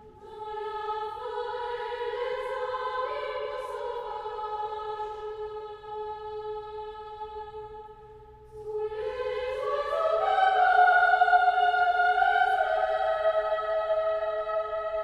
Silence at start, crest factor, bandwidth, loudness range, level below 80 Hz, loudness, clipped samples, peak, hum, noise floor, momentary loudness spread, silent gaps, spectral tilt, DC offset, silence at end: 0 s; 18 dB; 9.2 kHz; 15 LU; -58 dBFS; -27 LUFS; under 0.1%; -10 dBFS; none; -49 dBFS; 18 LU; none; -3.5 dB/octave; under 0.1%; 0 s